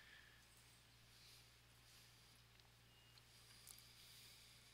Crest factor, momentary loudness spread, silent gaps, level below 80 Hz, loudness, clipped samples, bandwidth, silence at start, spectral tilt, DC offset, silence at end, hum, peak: 30 dB; 7 LU; none; -80 dBFS; -65 LUFS; under 0.1%; 16 kHz; 0 s; -1.5 dB/octave; under 0.1%; 0 s; none; -38 dBFS